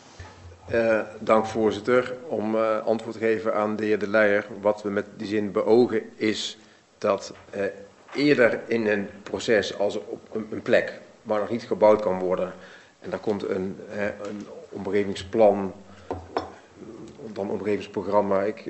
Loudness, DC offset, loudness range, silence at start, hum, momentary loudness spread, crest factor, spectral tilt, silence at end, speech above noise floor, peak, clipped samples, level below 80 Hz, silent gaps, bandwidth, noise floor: -25 LUFS; under 0.1%; 3 LU; 0.2 s; none; 17 LU; 20 dB; -5.5 dB/octave; 0 s; 20 dB; -6 dBFS; under 0.1%; -62 dBFS; none; 8.2 kHz; -44 dBFS